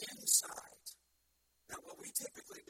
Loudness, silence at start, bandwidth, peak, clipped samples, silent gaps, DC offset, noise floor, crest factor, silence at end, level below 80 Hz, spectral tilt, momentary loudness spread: -34 LUFS; 0 s; 16.5 kHz; -16 dBFS; under 0.1%; none; under 0.1%; -78 dBFS; 26 dB; 0.1 s; -80 dBFS; 1 dB/octave; 21 LU